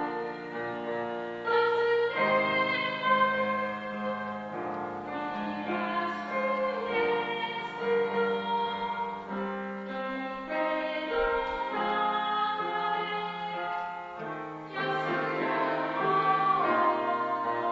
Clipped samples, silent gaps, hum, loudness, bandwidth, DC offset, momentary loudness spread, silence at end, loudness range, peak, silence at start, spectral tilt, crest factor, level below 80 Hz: under 0.1%; none; none; -30 LUFS; 7.6 kHz; under 0.1%; 10 LU; 0 s; 5 LU; -12 dBFS; 0 s; -2 dB/octave; 18 dB; -62 dBFS